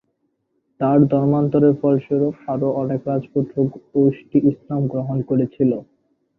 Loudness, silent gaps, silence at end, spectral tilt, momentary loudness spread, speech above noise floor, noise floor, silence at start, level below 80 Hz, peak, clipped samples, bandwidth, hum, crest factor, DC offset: -19 LUFS; none; 0.55 s; -12.5 dB/octave; 7 LU; 52 dB; -70 dBFS; 0.8 s; -58 dBFS; -2 dBFS; under 0.1%; 3.2 kHz; none; 16 dB; under 0.1%